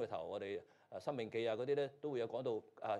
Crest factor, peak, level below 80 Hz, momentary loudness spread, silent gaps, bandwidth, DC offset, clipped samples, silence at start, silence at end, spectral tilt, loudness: 14 dB; -26 dBFS; -86 dBFS; 8 LU; none; 11 kHz; under 0.1%; under 0.1%; 0 s; 0 s; -6.5 dB/octave; -42 LUFS